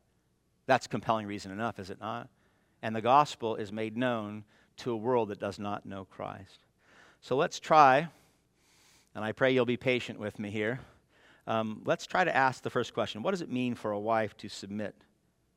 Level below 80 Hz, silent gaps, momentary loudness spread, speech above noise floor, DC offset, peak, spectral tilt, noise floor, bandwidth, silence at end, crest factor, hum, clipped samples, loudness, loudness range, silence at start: -72 dBFS; none; 17 LU; 42 dB; under 0.1%; -8 dBFS; -5.5 dB/octave; -73 dBFS; 14.5 kHz; 0.65 s; 24 dB; none; under 0.1%; -31 LUFS; 6 LU; 0.7 s